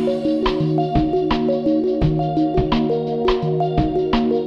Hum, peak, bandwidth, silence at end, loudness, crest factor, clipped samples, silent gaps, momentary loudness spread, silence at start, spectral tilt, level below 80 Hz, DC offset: none; -4 dBFS; 7 kHz; 0 s; -19 LUFS; 14 dB; under 0.1%; none; 1 LU; 0 s; -8.5 dB/octave; -32 dBFS; under 0.1%